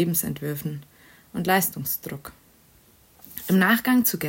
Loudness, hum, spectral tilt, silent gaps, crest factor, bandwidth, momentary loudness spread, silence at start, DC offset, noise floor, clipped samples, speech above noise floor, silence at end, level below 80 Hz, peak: -23 LUFS; none; -4.5 dB/octave; none; 18 dB; 16.5 kHz; 20 LU; 0 s; under 0.1%; -56 dBFS; under 0.1%; 33 dB; 0 s; -60 dBFS; -6 dBFS